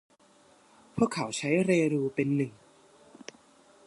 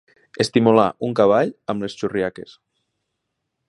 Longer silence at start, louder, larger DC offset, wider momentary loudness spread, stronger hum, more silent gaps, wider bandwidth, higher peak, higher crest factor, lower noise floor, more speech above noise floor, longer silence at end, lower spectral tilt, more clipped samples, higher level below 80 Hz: first, 0.95 s vs 0.4 s; second, -28 LUFS vs -19 LUFS; neither; first, 23 LU vs 11 LU; neither; neither; about the same, 11.5 kHz vs 11.5 kHz; second, -10 dBFS vs 0 dBFS; about the same, 20 dB vs 20 dB; second, -61 dBFS vs -77 dBFS; second, 33 dB vs 58 dB; about the same, 1.35 s vs 1.3 s; about the same, -6 dB/octave vs -6 dB/octave; neither; second, -66 dBFS vs -58 dBFS